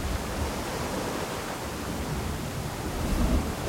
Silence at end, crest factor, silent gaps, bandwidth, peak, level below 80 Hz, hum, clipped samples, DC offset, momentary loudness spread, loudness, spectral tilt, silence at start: 0 s; 18 dB; none; 16.5 kHz; -12 dBFS; -34 dBFS; none; under 0.1%; under 0.1%; 6 LU; -31 LUFS; -5 dB/octave; 0 s